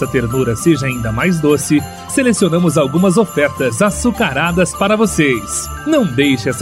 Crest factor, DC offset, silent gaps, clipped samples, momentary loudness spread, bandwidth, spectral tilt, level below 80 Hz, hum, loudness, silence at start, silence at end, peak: 14 dB; under 0.1%; none; under 0.1%; 4 LU; 16 kHz; -5 dB/octave; -36 dBFS; none; -14 LUFS; 0 s; 0 s; 0 dBFS